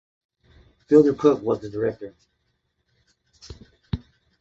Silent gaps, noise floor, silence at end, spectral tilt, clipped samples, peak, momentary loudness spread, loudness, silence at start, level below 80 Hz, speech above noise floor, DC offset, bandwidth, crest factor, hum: none; -73 dBFS; 0.45 s; -8 dB/octave; under 0.1%; -4 dBFS; 24 LU; -22 LUFS; 0.9 s; -50 dBFS; 53 dB; under 0.1%; 7.6 kHz; 22 dB; none